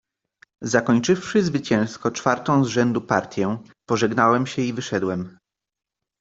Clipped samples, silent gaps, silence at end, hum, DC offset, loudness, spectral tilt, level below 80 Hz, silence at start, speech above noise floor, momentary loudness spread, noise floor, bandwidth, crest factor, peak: under 0.1%; none; 0.9 s; none; under 0.1%; -22 LUFS; -5.5 dB/octave; -60 dBFS; 0.6 s; 37 dB; 8 LU; -58 dBFS; 8 kHz; 20 dB; -2 dBFS